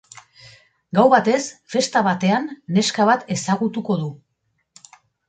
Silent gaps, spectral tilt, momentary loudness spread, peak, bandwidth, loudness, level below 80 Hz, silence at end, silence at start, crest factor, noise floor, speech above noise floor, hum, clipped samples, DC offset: none; -5 dB/octave; 9 LU; -2 dBFS; 9.4 kHz; -19 LUFS; -64 dBFS; 1.15 s; 0.95 s; 18 dB; -71 dBFS; 52 dB; none; under 0.1%; under 0.1%